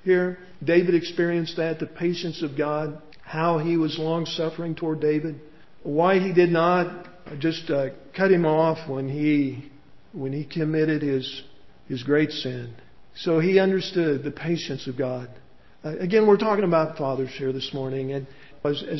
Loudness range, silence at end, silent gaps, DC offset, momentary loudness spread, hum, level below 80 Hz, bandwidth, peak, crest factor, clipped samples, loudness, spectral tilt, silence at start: 4 LU; 0 s; none; 0.4%; 15 LU; none; -62 dBFS; 6.2 kHz; -6 dBFS; 18 dB; under 0.1%; -24 LUFS; -7 dB/octave; 0.05 s